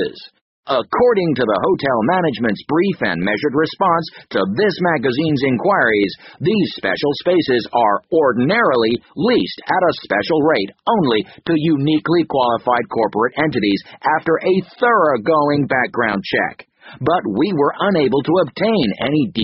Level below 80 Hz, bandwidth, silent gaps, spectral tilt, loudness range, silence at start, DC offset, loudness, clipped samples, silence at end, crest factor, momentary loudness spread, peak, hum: -54 dBFS; 6 kHz; 0.41-0.63 s; -4 dB/octave; 1 LU; 0 s; under 0.1%; -17 LUFS; under 0.1%; 0 s; 16 dB; 5 LU; -2 dBFS; none